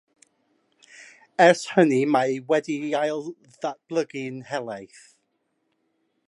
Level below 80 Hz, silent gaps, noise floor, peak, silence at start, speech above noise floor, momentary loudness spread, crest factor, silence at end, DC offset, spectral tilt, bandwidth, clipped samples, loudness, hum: -78 dBFS; none; -74 dBFS; -2 dBFS; 1 s; 51 dB; 16 LU; 22 dB; 1.45 s; under 0.1%; -5 dB/octave; 11.5 kHz; under 0.1%; -23 LUFS; none